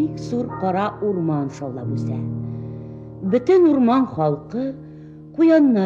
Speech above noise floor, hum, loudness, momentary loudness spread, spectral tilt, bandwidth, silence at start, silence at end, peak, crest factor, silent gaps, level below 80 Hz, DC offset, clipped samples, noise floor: 20 dB; none; -20 LUFS; 19 LU; -8.5 dB/octave; 7.6 kHz; 0 s; 0 s; -4 dBFS; 14 dB; none; -54 dBFS; under 0.1%; under 0.1%; -39 dBFS